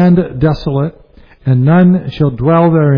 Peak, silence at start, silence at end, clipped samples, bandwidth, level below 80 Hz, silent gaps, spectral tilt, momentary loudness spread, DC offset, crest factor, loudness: 0 dBFS; 0 s; 0 s; under 0.1%; 5.2 kHz; -34 dBFS; none; -11 dB/octave; 9 LU; under 0.1%; 10 dB; -12 LUFS